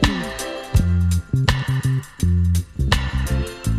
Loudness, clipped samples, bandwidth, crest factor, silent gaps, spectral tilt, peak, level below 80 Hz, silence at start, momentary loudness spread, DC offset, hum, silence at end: -21 LUFS; under 0.1%; 15 kHz; 16 dB; none; -5.5 dB/octave; -4 dBFS; -26 dBFS; 0 s; 5 LU; under 0.1%; none; 0 s